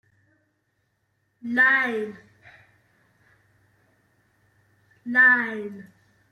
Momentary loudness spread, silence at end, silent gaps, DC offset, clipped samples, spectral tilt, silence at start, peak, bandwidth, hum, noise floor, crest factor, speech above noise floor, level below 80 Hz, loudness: 23 LU; 0.5 s; none; under 0.1%; under 0.1%; -5 dB/octave; 1.45 s; -8 dBFS; 12 kHz; none; -73 dBFS; 20 dB; 51 dB; -76 dBFS; -20 LUFS